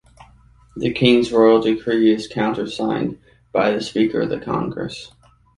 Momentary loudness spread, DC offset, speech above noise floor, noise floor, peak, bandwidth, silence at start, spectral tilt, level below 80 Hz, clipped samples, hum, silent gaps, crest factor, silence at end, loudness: 13 LU; under 0.1%; 32 dB; -50 dBFS; -2 dBFS; 11.5 kHz; 0.75 s; -6 dB/octave; -50 dBFS; under 0.1%; none; none; 18 dB; 0.5 s; -19 LUFS